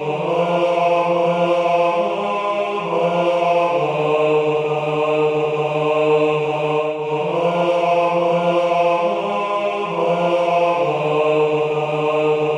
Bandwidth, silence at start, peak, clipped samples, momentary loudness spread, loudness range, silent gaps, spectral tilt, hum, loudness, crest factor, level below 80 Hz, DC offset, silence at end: 9.6 kHz; 0 s; -4 dBFS; under 0.1%; 4 LU; 1 LU; none; -6.5 dB/octave; none; -18 LUFS; 12 dB; -62 dBFS; under 0.1%; 0 s